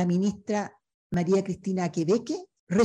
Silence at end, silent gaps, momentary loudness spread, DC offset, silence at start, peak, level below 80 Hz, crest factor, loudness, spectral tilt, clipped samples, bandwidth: 0 s; 0.94-1.10 s, 2.59-2.67 s; 9 LU; under 0.1%; 0 s; -10 dBFS; -60 dBFS; 16 dB; -28 LUFS; -7 dB/octave; under 0.1%; 9 kHz